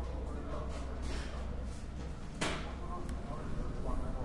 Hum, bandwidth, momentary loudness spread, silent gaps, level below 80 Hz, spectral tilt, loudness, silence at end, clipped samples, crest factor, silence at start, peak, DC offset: none; 11.5 kHz; 7 LU; none; -42 dBFS; -5.5 dB/octave; -42 LUFS; 0 s; under 0.1%; 16 dB; 0 s; -22 dBFS; under 0.1%